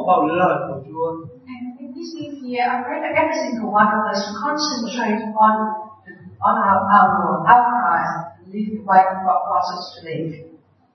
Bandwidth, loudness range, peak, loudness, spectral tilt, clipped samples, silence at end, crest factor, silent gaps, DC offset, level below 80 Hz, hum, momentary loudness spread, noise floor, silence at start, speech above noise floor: 6.4 kHz; 6 LU; 0 dBFS; -18 LUFS; -5 dB/octave; under 0.1%; 0.45 s; 20 dB; none; under 0.1%; -68 dBFS; none; 18 LU; -41 dBFS; 0 s; 23 dB